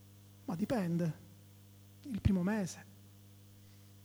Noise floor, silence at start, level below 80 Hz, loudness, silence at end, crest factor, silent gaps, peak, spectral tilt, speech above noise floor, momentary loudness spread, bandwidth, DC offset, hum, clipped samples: -58 dBFS; 0 s; -52 dBFS; -36 LUFS; 0 s; 22 dB; none; -16 dBFS; -7 dB/octave; 24 dB; 25 LU; over 20 kHz; under 0.1%; 50 Hz at -60 dBFS; under 0.1%